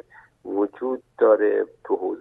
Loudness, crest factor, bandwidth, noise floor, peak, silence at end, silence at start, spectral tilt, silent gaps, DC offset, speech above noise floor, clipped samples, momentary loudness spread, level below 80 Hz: -23 LUFS; 18 dB; 3.8 kHz; -42 dBFS; -6 dBFS; 0 s; 0.45 s; -8.5 dB/octave; none; under 0.1%; 20 dB; under 0.1%; 12 LU; -72 dBFS